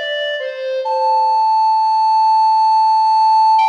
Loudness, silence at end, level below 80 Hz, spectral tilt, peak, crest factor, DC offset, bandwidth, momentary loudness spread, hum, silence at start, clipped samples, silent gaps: -14 LUFS; 0 s; -88 dBFS; 3.5 dB/octave; -6 dBFS; 8 dB; under 0.1%; 8.4 kHz; 9 LU; none; 0 s; under 0.1%; none